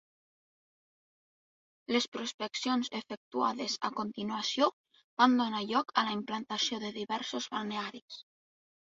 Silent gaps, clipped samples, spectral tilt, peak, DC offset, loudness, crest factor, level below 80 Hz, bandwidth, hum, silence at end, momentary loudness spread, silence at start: 2.08-2.12 s, 2.34-2.38 s, 3.17-3.31 s, 4.73-4.84 s, 5.04-5.17 s, 8.02-8.08 s; under 0.1%; -3 dB/octave; -10 dBFS; under 0.1%; -33 LUFS; 24 dB; -78 dBFS; 7.8 kHz; none; 0.6 s; 12 LU; 1.9 s